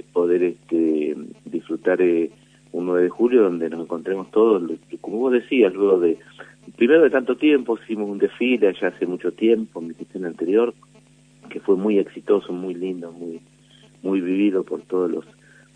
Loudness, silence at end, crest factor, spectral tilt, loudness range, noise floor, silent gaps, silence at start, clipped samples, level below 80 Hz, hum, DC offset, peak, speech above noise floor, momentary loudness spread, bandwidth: -21 LUFS; 0.55 s; 18 dB; -7 dB/octave; 5 LU; -52 dBFS; none; 0.15 s; under 0.1%; -70 dBFS; none; under 0.1%; -2 dBFS; 32 dB; 14 LU; 9.6 kHz